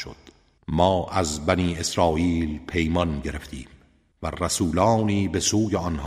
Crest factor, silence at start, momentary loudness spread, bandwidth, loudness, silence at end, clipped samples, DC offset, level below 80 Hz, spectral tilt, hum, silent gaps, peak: 20 dB; 0 s; 14 LU; 15.5 kHz; -23 LUFS; 0 s; under 0.1%; under 0.1%; -40 dBFS; -5 dB/octave; none; none; -4 dBFS